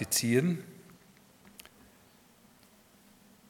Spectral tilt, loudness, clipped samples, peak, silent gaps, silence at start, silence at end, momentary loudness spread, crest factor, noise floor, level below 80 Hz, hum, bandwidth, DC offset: -4 dB/octave; -29 LUFS; under 0.1%; -12 dBFS; none; 0 s; 2.7 s; 28 LU; 24 dB; -61 dBFS; -74 dBFS; none; 18 kHz; under 0.1%